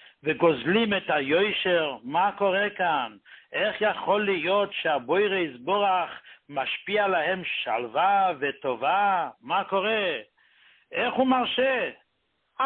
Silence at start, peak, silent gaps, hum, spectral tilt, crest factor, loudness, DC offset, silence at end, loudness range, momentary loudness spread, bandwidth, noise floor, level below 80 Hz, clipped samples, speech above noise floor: 0.25 s; -8 dBFS; none; none; -9 dB/octave; 18 dB; -25 LUFS; under 0.1%; 0 s; 1 LU; 7 LU; 4.4 kHz; -74 dBFS; -68 dBFS; under 0.1%; 49 dB